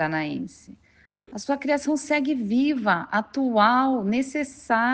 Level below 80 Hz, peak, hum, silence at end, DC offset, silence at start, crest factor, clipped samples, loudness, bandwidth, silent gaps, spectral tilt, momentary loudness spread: -62 dBFS; -6 dBFS; none; 0 s; under 0.1%; 0 s; 18 dB; under 0.1%; -23 LUFS; 9.4 kHz; none; -5 dB/octave; 12 LU